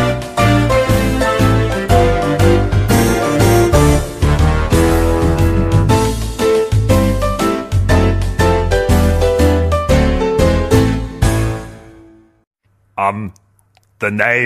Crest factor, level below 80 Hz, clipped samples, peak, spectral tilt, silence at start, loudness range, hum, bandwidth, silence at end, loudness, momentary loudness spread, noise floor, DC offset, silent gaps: 12 dB; -20 dBFS; under 0.1%; 0 dBFS; -6 dB/octave; 0 s; 5 LU; none; 15.5 kHz; 0 s; -14 LUFS; 6 LU; -54 dBFS; under 0.1%; 12.47-12.51 s